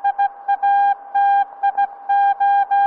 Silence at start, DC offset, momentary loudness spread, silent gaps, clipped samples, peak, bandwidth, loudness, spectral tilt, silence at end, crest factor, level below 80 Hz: 0.05 s; under 0.1%; 5 LU; none; under 0.1%; -10 dBFS; 4.3 kHz; -18 LUFS; -2.5 dB/octave; 0 s; 8 dB; -70 dBFS